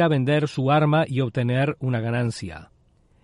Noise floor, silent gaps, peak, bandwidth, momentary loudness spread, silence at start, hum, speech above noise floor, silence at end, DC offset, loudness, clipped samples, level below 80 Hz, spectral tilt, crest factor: -59 dBFS; none; -8 dBFS; 11 kHz; 12 LU; 0 s; none; 38 dB; 0.6 s; under 0.1%; -22 LUFS; under 0.1%; -56 dBFS; -7.5 dB/octave; 14 dB